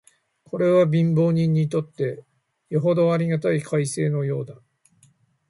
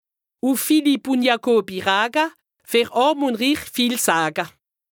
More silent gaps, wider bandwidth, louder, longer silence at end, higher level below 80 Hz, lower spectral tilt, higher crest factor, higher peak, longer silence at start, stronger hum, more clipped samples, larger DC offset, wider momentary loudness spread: neither; second, 11.5 kHz vs over 20 kHz; about the same, -22 LUFS vs -20 LUFS; first, 0.95 s vs 0.45 s; about the same, -64 dBFS vs -64 dBFS; first, -7.5 dB/octave vs -3 dB/octave; about the same, 14 dB vs 18 dB; second, -8 dBFS vs -2 dBFS; about the same, 0.55 s vs 0.45 s; neither; neither; neither; first, 10 LU vs 6 LU